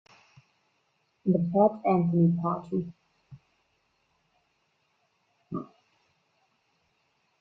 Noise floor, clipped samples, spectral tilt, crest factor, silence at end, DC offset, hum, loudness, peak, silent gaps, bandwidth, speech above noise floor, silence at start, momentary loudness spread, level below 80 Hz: -73 dBFS; under 0.1%; -11.5 dB/octave; 22 dB; 1.75 s; under 0.1%; none; -26 LUFS; -10 dBFS; none; 4.4 kHz; 48 dB; 1.25 s; 16 LU; -70 dBFS